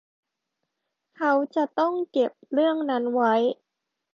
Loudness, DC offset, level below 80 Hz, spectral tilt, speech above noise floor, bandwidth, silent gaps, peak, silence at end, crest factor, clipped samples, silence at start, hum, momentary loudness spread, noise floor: -24 LUFS; under 0.1%; -80 dBFS; -6 dB/octave; 59 dB; 7.2 kHz; none; -10 dBFS; 0.6 s; 16 dB; under 0.1%; 1.2 s; none; 5 LU; -83 dBFS